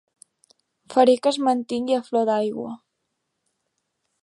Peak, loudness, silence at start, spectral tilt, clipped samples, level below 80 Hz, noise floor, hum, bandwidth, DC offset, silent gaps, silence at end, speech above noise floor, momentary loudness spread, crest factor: -4 dBFS; -21 LUFS; 0.9 s; -4.5 dB/octave; under 0.1%; -74 dBFS; -77 dBFS; none; 11.5 kHz; under 0.1%; none; 1.45 s; 56 dB; 15 LU; 20 dB